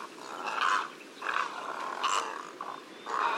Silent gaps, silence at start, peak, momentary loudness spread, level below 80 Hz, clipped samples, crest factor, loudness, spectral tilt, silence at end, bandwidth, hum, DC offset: none; 0 s; -14 dBFS; 13 LU; under -90 dBFS; under 0.1%; 20 dB; -33 LUFS; -0.5 dB/octave; 0 s; 16 kHz; none; under 0.1%